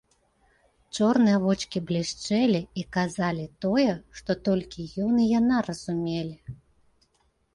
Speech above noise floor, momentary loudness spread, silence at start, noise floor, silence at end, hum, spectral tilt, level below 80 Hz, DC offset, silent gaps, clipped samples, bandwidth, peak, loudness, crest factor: 44 dB; 12 LU; 0.95 s; -69 dBFS; 1 s; none; -6 dB/octave; -56 dBFS; under 0.1%; none; under 0.1%; 11.5 kHz; -10 dBFS; -26 LUFS; 16 dB